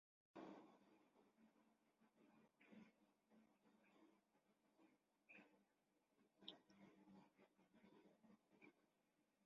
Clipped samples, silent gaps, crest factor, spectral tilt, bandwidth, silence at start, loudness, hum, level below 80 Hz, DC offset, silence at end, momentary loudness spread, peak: under 0.1%; none; 34 dB; -3 dB/octave; 6.8 kHz; 0.35 s; -65 LUFS; none; under -90 dBFS; under 0.1%; 0 s; 7 LU; -38 dBFS